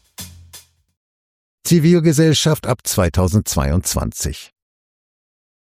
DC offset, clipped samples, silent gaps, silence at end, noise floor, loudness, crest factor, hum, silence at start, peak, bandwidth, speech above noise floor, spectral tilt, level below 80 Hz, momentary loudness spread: under 0.1%; under 0.1%; 0.97-1.58 s; 1.25 s; -45 dBFS; -16 LUFS; 18 dB; none; 0.2 s; -2 dBFS; 16 kHz; 29 dB; -5 dB/octave; -34 dBFS; 19 LU